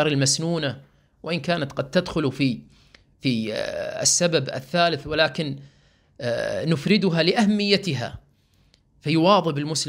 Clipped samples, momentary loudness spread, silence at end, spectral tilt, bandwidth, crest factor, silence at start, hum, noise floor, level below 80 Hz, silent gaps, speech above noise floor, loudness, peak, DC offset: under 0.1%; 11 LU; 0 s; -4 dB/octave; 16 kHz; 20 dB; 0 s; none; -61 dBFS; -54 dBFS; none; 38 dB; -22 LUFS; -4 dBFS; under 0.1%